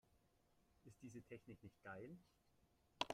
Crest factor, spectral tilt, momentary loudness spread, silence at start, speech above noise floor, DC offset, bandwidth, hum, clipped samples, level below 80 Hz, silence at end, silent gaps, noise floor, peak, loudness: 34 dB; -4 dB/octave; 9 LU; 0.1 s; 20 dB; under 0.1%; 15 kHz; none; under 0.1%; -82 dBFS; 0 s; none; -79 dBFS; -24 dBFS; -58 LUFS